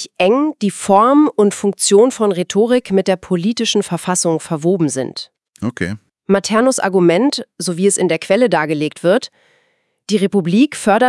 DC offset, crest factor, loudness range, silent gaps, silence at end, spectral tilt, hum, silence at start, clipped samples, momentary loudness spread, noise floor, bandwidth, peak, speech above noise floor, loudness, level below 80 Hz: under 0.1%; 14 dB; 4 LU; none; 0 s; -4.5 dB/octave; none; 0 s; under 0.1%; 11 LU; -62 dBFS; 12 kHz; 0 dBFS; 48 dB; -15 LUFS; -60 dBFS